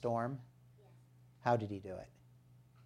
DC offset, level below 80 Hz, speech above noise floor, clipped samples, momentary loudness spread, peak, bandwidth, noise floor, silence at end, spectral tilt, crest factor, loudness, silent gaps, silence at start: under 0.1%; -74 dBFS; 26 dB; under 0.1%; 20 LU; -18 dBFS; 11 kHz; -64 dBFS; 0.75 s; -8 dB/octave; 24 dB; -39 LUFS; none; 0 s